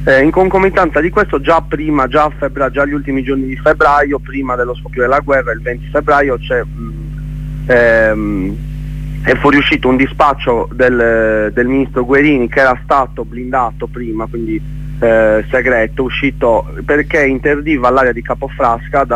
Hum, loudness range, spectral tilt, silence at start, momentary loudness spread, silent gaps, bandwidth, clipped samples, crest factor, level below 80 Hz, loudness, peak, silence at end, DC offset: none; 3 LU; -7 dB/octave; 0 s; 11 LU; none; 10.5 kHz; under 0.1%; 12 dB; -26 dBFS; -12 LUFS; 0 dBFS; 0 s; under 0.1%